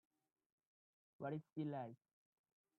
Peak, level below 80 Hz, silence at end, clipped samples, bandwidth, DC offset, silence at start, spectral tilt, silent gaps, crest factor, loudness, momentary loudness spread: -34 dBFS; under -90 dBFS; 0.85 s; under 0.1%; 4.2 kHz; under 0.1%; 1.2 s; -8 dB/octave; 1.52-1.56 s; 18 dB; -49 LUFS; 8 LU